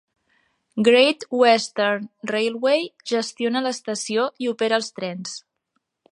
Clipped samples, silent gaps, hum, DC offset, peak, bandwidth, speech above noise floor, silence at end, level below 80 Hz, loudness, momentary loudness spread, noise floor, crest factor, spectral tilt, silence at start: under 0.1%; none; none; under 0.1%; -4 dBFS; 11 kHz; 54 dB; 0.75 s; -76 dBFS; -21 LUFS; 13 LU; -75 dBFS; 20 dB; -3.5 dB/octave; 0.75 s